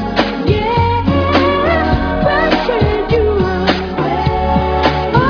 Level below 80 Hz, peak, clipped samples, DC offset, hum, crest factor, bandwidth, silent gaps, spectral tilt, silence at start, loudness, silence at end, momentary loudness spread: -24 dBFS; 0 dBFS; under 0.1%; under 0.1%; none; 14 dB; 5.4 kHz; none; -7.5 dB/octave; 0 s; -14 LUFS; 0 s; 3 LU